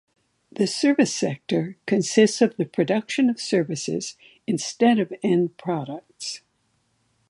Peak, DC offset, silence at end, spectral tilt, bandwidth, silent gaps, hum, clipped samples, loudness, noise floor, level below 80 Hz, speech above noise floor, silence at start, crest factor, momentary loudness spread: -4 dBFS; under 0.1%; 0.9 s; -5 dB/octave; 11.5 kHz; none; none; under 0.1%; -23 LUFS; -69 dBFS; -72 dBFS; 47 dB; 0.6 s; 20 dB; 14 LU